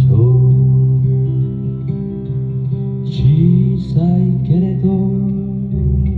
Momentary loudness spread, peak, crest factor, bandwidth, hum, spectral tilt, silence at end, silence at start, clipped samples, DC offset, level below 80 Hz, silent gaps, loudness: 10 LU; -2 dBFS; 12 dB; 4.5 kHz; none; -12 dB/octave; 0 s; 0 s; under 0.1%; under 0.1%; -30 dBFS; none; -15 LUFS